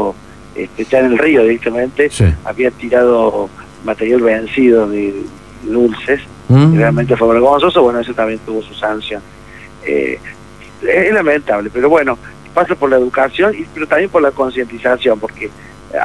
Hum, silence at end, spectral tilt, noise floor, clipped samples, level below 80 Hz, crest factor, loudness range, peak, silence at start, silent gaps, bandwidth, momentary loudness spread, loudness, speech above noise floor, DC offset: none; 0 s; -7 dB/octave; -35 dBFS; under 0.1%; -38 dBFS; 14 dB; 4 LU; 0 dBFS; 0 s; none; 12 kHz; 15 LU; -13 LUFS; 22 dB; 0.5%